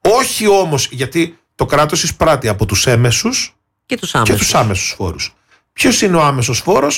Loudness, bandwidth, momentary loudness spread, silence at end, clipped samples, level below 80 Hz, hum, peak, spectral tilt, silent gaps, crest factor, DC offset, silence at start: -14 LUFS; 17 kHz; 10 LU; 0 s; under 0.1%; -36 dBFS; none; -2 dBFS; -4 dB/octave; none; 12 dB; under 0.1%; 0.05 s